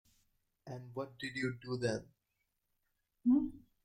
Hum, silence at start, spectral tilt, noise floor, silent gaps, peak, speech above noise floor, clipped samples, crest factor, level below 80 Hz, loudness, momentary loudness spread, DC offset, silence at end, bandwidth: none; 0.65 s; -6.5 dB/octave; -84 dBFS; none; -22 dBFS; 48 dB; under 0.1%; 18 dB; -68 dBFS; -37 LUFS; 14 LU; under 0.1%; 0.25 s; 10 kHz